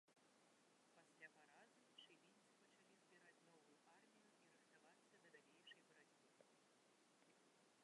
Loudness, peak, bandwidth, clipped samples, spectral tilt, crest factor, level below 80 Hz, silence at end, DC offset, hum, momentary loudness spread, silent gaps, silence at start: -68 LUFS; -50 dBFS; 11 kHz; under 0.1%; -2 dB/octave; 24 dB; under -90 dBFS; 0 s; under 0.1%; none; 3 LU; none; 0.05 s